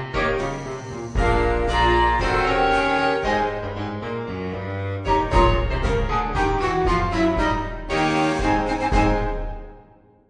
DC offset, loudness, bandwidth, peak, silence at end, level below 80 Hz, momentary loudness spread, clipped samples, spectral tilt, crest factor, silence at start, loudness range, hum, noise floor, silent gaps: under 0.1%; -22 LUFS; 10 kHz; -4 dBFS; 0.5 s; -28 dBFS; 10 LU; under 0.1%; -6 dB/octave; 18 dB; 0 s; 2 LU; none; -51 dBFS; none